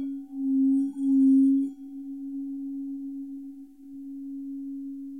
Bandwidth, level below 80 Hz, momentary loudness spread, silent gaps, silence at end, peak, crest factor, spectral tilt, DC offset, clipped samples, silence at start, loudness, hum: 0.9 kHz; -76 dBFS; 20 LU; none; 0 s; -14 dBFS; 12 dB; -8.5 dB/octave; 0.1%; under 0.1%; 0 s; -27 LUFS; none